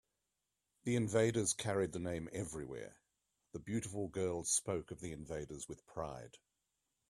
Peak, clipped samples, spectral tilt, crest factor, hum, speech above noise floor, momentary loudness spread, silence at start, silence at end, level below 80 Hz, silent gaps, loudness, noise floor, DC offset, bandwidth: -20 dBFS; under 0.1%; -4.5 dB/octave; 22 dB; none; 48 dB; 16 LU; 0.85 s; 0.75 s; -66 dBFS; none; -39 LUFS; -88 dBFS; under 0.1%; 14 kHz